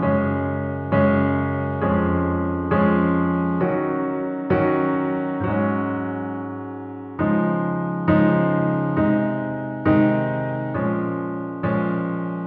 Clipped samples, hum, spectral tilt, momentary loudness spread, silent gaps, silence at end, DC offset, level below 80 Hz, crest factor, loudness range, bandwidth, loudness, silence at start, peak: under 0.1%; none; -12 dB/octave; 8 LU; none; 0 s; under 0.1%; -46 dBFS; 18 dB; 3 LU; 4.4 kHz; -22 LUFS; 0 s; -4 dBFS